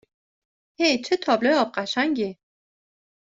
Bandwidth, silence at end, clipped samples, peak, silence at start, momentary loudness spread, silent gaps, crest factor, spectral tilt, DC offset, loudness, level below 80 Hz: 8 kHz; 0.9 s; under 0.1%; -6 dBFS; 0.8 s; 6 LU; none; 18 dB; -3.5 dB/octave; under 0.1%; -23 LUFS; -70 dBFS